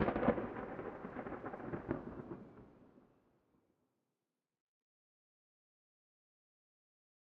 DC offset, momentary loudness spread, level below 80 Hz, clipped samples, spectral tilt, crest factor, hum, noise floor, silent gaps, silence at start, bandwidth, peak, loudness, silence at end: under 0.1%; 19 LU; -64 dBFS; under 0.1%; -7 dB/octave; 28 dB; none; under -90 dBFS; none; 0 s; 5.6 kHz; -18 dBFS; -43 LUFS; 4.3 s